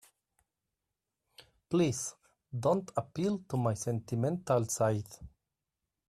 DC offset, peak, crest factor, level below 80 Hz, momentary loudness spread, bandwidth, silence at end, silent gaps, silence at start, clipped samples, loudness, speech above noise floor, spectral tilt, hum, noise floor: under 0.1%; -16 dBFS; 18 dB; -66 dBFS; 9 LU; 14 kHz; 0.8 s; none; 1.4 s; under 0.1%; -33 LUFS; 56 dB; -6 dB/octave; none; -88 dBFS